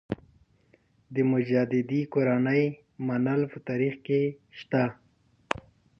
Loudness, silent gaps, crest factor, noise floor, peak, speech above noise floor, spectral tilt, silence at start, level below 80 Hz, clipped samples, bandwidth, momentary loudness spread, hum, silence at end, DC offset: -28 LUFS; none; 22 dB; -64 dBFS; -6 dBFS; 38 dB; -8.5 dB/octave; 0.1 s; -64 dBFS; under 0.1%; 8.2 kHz; 10 LU; none; 0.4 s; under 0.1%